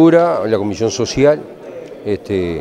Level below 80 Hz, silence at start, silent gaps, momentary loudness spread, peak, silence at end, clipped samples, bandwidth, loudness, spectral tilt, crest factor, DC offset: -46 dBFS; 0 s; none; 18 LU; 0 dBFS; 0 s; under 0.1%; 9.6 kHz; -16 LUFS; -6 dB/octave; 14 dB; under 0.1%